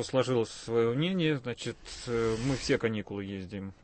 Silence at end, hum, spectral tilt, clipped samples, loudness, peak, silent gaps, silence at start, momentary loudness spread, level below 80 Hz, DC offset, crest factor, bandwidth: 0.1 s; none; -5.5 dB/octave; under 0.1%; -31 LUFS; -14 dBFS; none; 0 s; 10 LU; -54 dBFS; under 0.1%; 16 dB; 8.8 kHz